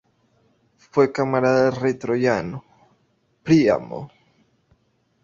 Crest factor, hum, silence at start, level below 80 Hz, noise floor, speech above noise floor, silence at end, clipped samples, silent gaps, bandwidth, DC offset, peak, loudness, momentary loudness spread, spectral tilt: 20 dB; none; 0.95 s; -58 dBFS; -65 dBFS; 46 dB; 1.15 s; under 0.1%; none; 7.4 kHz; under 0.1%; -4 dBFS; -20 LUFS; 18 LU; -7 dB/octave